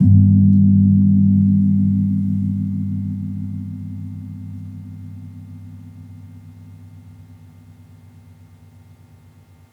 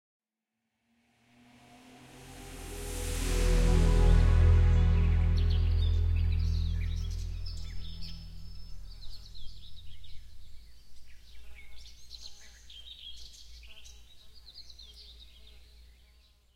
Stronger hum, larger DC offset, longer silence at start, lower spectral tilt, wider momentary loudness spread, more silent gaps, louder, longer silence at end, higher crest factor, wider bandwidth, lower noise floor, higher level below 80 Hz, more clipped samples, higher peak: neither; neither; second, 0 s vs 2.15 s; first, -12 dB/octave vs -6 dB/octave; about the same, 25 LU vs 26 LU; neither; first, -16 LUFS vs -29 LUFS; first, 2.6 s vs 1.05 s; about the same, 16 dB vs 18 dB; second, 2.2 kHz vs 13.5 kHz; second, -47 dBFS vs -86 dBFS; second, -54 dBFS vs -32 dBFS; neither; first, -2 dBFS vs -12 dBFS